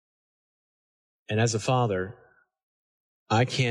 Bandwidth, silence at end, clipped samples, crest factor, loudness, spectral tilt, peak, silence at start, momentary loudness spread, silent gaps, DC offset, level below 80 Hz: 11 kHz; 0 s; under 0.1%; 18 dB; -26 LUFS; -5 dB/octave; -12 dBFS; 1.3 s; 7 LU; 2.63-3.26 s; under 0.1%; -68 dBFS